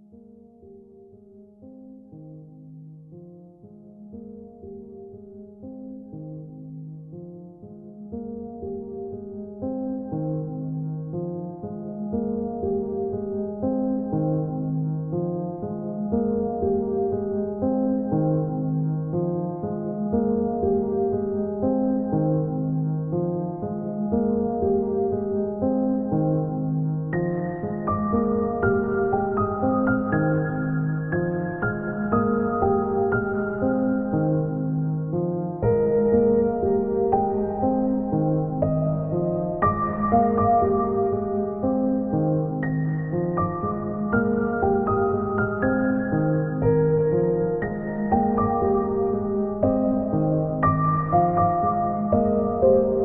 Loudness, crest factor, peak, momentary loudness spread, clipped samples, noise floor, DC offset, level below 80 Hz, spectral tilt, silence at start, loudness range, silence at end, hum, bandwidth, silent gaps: -24 LUFS; 16 dB; -8 dBFS; 17 LU; under 0.1%; -49 dBFS; under 0.1%; -46 dBFS; -12 dB/octave; 0.15 s; 15 LU; 0 s; none; 2.6 kHz; none